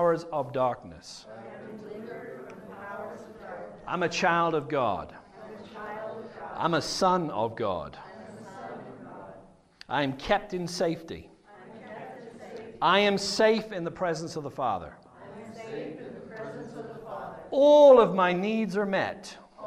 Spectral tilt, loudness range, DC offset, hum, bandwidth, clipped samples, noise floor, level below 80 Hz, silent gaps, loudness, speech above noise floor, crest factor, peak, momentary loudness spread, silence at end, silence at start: -5 dB/octave; 12 LU; under 0.1%; none; 13 kHz; under 0.1%; -53 dBFS; -60 dBFS; none; -26 LUFS; 28 dB; 22 dB; -6 dBFS; 21 LU; 0 s; 0 s